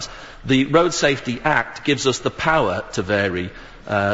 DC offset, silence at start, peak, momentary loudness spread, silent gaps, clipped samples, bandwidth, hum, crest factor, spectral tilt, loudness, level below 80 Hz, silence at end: 0.3%; 0 s; -2 dBFS; 13 LU; none; under 0.1%; 8 kHz; none; 18 dB; -4.5 dB/octave; -20 LUFS; -44 dBFS; 0 s